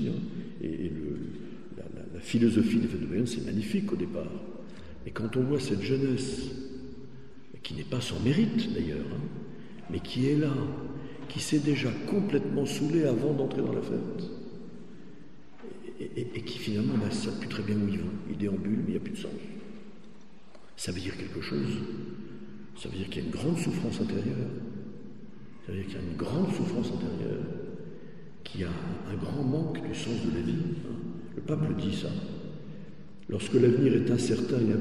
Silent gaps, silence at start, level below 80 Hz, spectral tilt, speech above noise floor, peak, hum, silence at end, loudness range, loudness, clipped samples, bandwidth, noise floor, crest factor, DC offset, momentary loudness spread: none; 0 s; -56 dBFS; -6.5 dB/octave; 25 dB; -12 dBFS; none; 0 s; 6 LU; -31 LUFS; under 0.1%; 12.5 kHz; -55 dBFS; 20 dB; 0.7%; 19 LU